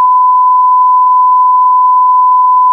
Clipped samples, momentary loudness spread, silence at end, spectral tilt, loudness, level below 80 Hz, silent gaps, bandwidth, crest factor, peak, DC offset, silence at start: under 0.1%; 0 LU; 0 s; -3 dB/octave; -7 LUFS; under -90 dBFS; none; 1.2 kHz; 4 dB; -2 dBFS; under 0.1%; 0 s